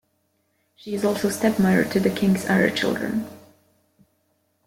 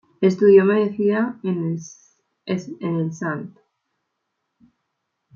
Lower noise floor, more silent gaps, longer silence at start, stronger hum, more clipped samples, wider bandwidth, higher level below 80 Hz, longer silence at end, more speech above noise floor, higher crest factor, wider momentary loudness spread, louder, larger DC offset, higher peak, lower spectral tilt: second, -69 dBFS vs -77 dBFS; neither; first, 0.85 s vs 0.2 s; neither; neither; first, 16.5 kHz vs 7.2 kHz; first, -56 dBFS vs -68 dBFS; second, 1.3 s vs 1.85 s; second, 48 dB vs 58 dB; about the same, 18 dB vs 18 dB; second, 11 LU vs 18 LU; about the same, -22 LUFS vs -20 LUFS; neither; second, -6 dBFS vs -2 dBFS; second, -5.5 dB/octave vs -7.5 dB/octave